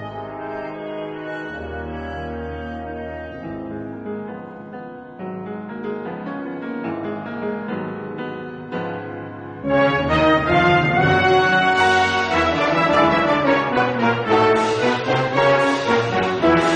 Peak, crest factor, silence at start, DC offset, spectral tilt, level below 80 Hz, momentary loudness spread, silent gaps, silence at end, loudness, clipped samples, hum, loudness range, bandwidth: -4 dBFS; 16 dB; 0 s; under 0.1%; -5.5 dB/octave; -44 dBFS; 16 LU; none; 0 s; -19 LUFS; under 0.1%; none; 15 LU; 10 kHz